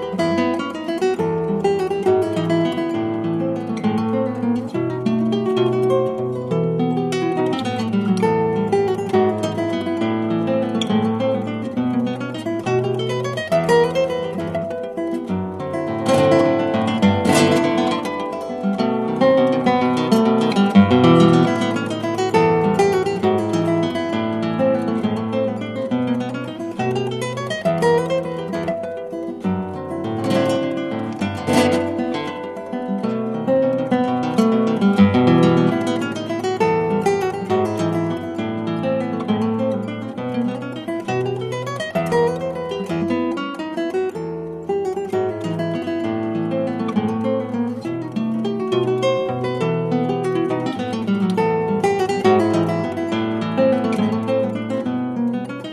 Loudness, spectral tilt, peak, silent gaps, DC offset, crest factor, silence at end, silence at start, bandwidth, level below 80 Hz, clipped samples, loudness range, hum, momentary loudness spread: -20 LUFS; -6.5 dB/octave; 0 dBFS; none; under 0.1%; 18 dB; 0 s; 0 s; 14 kHz; -58 dBFS; under 0.1%; 6 LU; none; 9 LU